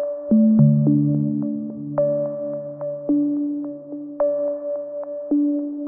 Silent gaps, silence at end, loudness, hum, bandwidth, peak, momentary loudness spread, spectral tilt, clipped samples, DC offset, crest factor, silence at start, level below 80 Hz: none; 0 s; -21 LUFS; none; 1.9 kHz; -4 dBFS; 14 LU; -16.5 dB/octave; under 0.1%; under 0.1%; 16 dB; 0 s; -62 dBFS